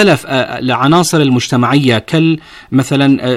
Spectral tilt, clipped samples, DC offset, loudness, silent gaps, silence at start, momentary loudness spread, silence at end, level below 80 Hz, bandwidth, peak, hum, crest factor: -5.5 dB/octave; under 0.1%; under 0.1%; -12 LUFS; none; 0 s; 6 LU; 0 s; -48 dBFS; 15 kHz; 0 dBFS; none; 10 dB